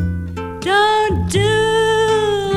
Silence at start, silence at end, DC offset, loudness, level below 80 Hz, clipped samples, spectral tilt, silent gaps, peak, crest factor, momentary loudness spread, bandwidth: 0 s; 0 s; under 0.1%; -16 LUFS; -34 dBFS; under 0.1%; -4.5 dB/octave; none; -4 dBFS; 12 dB; 10 LU; 14 kHz